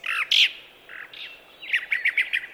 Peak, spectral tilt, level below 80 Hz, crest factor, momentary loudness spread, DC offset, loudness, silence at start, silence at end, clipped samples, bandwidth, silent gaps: -8 dBFS; 2.5 dB/octave; -72 dBFS; 20 dB; 22 LU; under 0.1%; -21 LUFS; 0.05 s; 0 s; under 0.1%; over 20 kHz; none